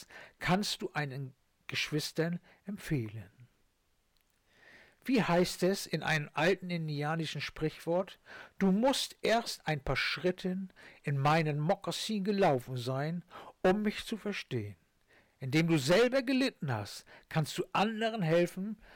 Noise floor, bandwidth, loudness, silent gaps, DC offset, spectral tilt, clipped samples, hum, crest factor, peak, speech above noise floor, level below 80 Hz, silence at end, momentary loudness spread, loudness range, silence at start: -74 dBFS; 18 kHz; -32 LUFS; none; under 0.1%; -5.5 dB/octave; under 0.1%; none; 12 dB; -22 dBFS; 42 dB; -60 dBFS; 0 s; 15 LU; 6 LU; 0 s